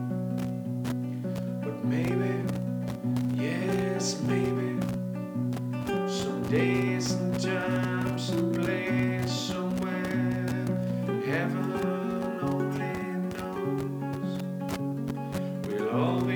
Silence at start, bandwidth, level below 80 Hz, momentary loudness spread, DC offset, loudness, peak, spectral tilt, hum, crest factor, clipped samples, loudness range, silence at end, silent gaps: 0 s; 19.5 kHz; -58 dBFS; 5 LU; under 0.1%; -30 LUFS; -14 dBFS; -6.5 dB/octave; none; 14 dB; under 0.1%; 3 LU; 0 s; none